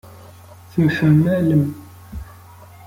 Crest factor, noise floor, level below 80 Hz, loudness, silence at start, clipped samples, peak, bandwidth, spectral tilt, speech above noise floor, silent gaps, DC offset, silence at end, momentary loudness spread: 16 dB; -42 dBFS; -44 dBFS; -17 LUFS; 0.75 s; under 0.1%; -4 dBFS; 16 kHz; -8.5 dB/octave; 27 dB; none; under 0.1%; 0.65 s; 21 LU